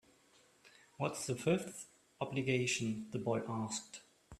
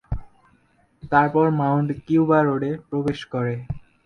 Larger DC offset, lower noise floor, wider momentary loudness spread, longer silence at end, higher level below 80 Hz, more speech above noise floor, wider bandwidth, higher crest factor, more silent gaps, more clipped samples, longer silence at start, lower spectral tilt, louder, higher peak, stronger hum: neither; first, -68 dBFS vs -61 dBFS; about the same, 16 LU vs 14 LU; second, 0 s vs 0.25 s; second, -74 dBFS vs -44 dBFS; second, 31 dB vs 40 dB; first, 14 kHz vs 9 kHz; about the same, 22 dB vs 18 dB; neither; neither; first, 0.65 s vs 0.1 s; second, -4.5 dB/octave vs -9 dB/octave; second, -38 LUFS vs -21 LUFS; second, -18 dBFS vs -4 dBFS; neither